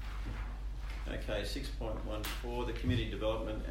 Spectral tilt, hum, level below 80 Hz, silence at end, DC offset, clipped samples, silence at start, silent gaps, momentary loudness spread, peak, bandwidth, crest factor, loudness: -5.5 dB/octave; none; -40 dBFS; 0 s; under 0.1%; under 0.1%; 0 s; none; 8 LU; -20 dBFS; 16 kHz; 18 dB; -39 LUFS